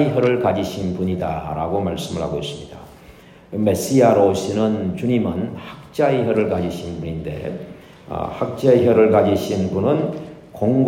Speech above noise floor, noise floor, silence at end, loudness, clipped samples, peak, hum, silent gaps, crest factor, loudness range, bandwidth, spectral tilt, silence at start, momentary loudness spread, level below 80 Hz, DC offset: 26 dB; -44 dBFS; 0 s; -19 LUFS; under 0.1%; 0 dBFS; none; none; 18 dB; 5 LU; 16 kHz; -7 dB/octave; 0 s; 16 LU; -50 dBFS; under 0.1%